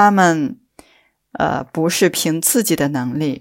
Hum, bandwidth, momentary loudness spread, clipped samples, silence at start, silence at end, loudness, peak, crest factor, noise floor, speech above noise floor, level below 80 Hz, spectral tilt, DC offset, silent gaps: none; 16.5 kHz; 7 LU; under 0.1%; 0 s; 0 s; -17 LUFS; 0 dBFS; 16 dB; -57 dBFS; 40 dB; -54 dBFS; -4 dB/octave; under 0.1%; none